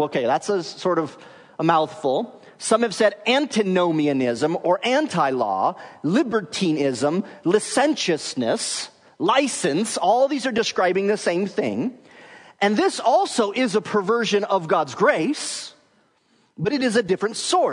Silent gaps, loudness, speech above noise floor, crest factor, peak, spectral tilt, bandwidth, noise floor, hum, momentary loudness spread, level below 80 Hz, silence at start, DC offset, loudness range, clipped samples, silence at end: none; -21 LUFS; 41 dB; 18 dB; -4 dBFS; -4 dB/octave; 11 kHz; -62 dBFS; none; 6 LU; -70 dBFS; 0 s; under 0.1%; 2 LU; under 0.1%; 0 s